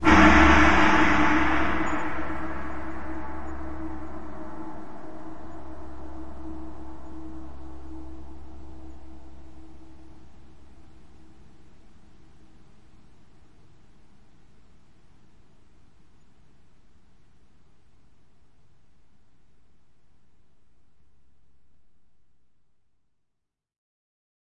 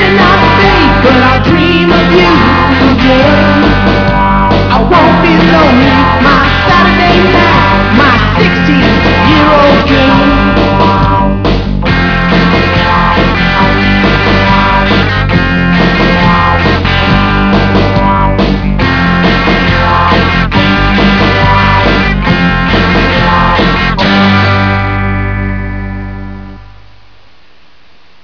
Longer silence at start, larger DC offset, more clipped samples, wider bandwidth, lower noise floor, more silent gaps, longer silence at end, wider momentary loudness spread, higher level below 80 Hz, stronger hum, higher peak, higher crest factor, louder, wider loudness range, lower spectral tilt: about the same, 0 s vs 0 s; second, under 0.1% vs 2%; second, under 0.1% vs 1%; first, 8.8 kHz vs 5.4 kHz; first, -80 dBFS vs -44 dBFS; neither; second, 0.7 s vs 1.6 s; first, 29 LU vs 5 LU; second, -40 dBFS vs -18 dBFS; neither; second, -4 dBFS vs 0 dBFS; first, 24 dB vs 8 dB; second, -22 LUFS vs -7 LUFS; first, 28 LU vs 3 LU; second, -5.5 dB/octave vs -7 dB/octave